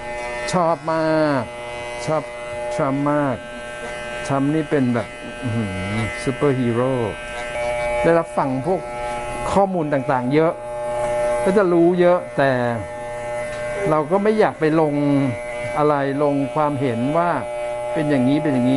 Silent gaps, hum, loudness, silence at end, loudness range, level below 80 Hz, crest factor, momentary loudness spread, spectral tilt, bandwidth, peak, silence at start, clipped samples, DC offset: none; none; -20 LUFS; 0 s; 4 LU; -44 dBFS; 16 dB; 10 LU; -6.5 dB/octave; 11.5 kHz; -4 dBFS; 0 s; under 0.1%; under 0.1%